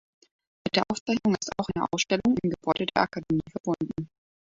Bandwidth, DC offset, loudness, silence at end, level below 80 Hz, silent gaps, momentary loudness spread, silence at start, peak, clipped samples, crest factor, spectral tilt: 7.8 kHz; under 0.1%; -28 LUFS; 0.45 s; -56 dBFS; 1.00-1.06 s, 3.60-3.64 s; 8 LU; 0.65 s; -6 dBFS; under 0.1%; 22 dB; -4.5 dB/octave